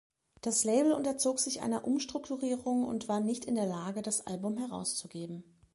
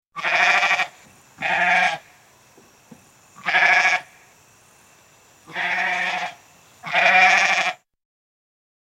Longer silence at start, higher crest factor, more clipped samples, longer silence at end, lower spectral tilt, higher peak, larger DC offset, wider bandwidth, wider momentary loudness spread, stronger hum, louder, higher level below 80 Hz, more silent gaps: first, 0.45 s vs 0.15 s; about the same, 18 dB vs 22 dB; neither; second, 0.3 s vs 1.25 s; first, -4 dB/octave vs -1 dB/octave; second, -16 dBFS vs -2 dBFS; neither; second, 11.5 kHz vs 15.5 kHz; second, 10 LU vs 16 LU; neither; second, -33 LUFS vs -18 LUFS; about the same, -70 dBFS vs -72 dBFS; neither